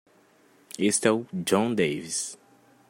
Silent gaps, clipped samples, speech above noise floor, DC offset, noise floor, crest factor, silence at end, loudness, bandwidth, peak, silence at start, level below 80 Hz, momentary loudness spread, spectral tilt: none; under 0.1%; 34 dB; under 0.1%; -60 dBFS; 22 dB; 0.55 s; -26 LUFS; 16 kHz; -6 dBFS; 0.8 s; -70 dBFS; 9 LU; -4 dB/octave